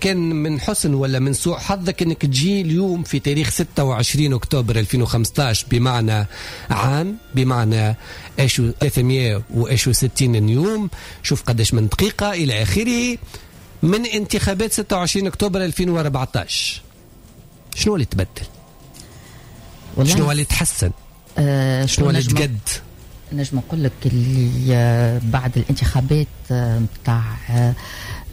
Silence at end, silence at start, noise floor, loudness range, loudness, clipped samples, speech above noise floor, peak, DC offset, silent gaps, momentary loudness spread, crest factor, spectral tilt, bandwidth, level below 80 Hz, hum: 0 s; 0 s; -44 dBFS; 3 LU; -19 LUFS; under 0.1%; 26 dB; -4 dBFS; under 0.1%; none; 7 LU; 14 dB; -5 dB/octave; 16 kHz; -34 dBFS; none